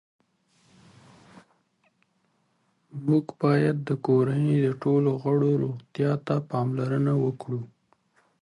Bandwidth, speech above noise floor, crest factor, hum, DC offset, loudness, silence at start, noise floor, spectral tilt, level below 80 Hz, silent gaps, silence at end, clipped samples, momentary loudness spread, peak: 10.5 kHz; 46 dB; 18 dB; none; under 0.1%; -25 LUFS; 2.95 s; -70 dBFS; -9.5 dB/octave; -68 dBFS; none; 0.75 s; under 0.1%; 10 LU; -10 dBFS